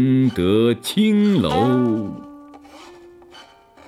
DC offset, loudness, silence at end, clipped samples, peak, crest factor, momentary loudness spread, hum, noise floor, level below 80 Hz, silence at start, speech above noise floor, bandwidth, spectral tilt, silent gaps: under 0.1%; -18 LUFS; 0.45 s; under 0.1%; -4 dBFS; 14 dB; 8 LU; none; -46 dBFS; -50 dBFS; 0 s; 29 dB; 15 kHz; -7 dB/octave; none